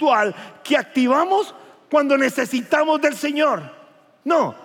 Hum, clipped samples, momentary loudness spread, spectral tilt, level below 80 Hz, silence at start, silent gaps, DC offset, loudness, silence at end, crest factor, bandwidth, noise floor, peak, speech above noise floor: none; under 0.1%; 8 LU; -4 dB/octave; -88 dBFS; 0 s; none; under 0.1%; -19 LUFS; 0 s; 16 dB; 17 kHz; -50 dBFS; -4 dBFS; 31 dB